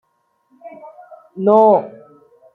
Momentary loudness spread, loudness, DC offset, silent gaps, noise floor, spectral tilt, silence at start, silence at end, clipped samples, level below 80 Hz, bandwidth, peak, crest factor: 26 LU; -14 LUFS; under 0.1%; none; -64 dBFS; -10 dB/octave; 0.65 s; 0.65 s; under 0.1%; -70 dBFS; 4.3 kHz; -2 dBFS; 16 dB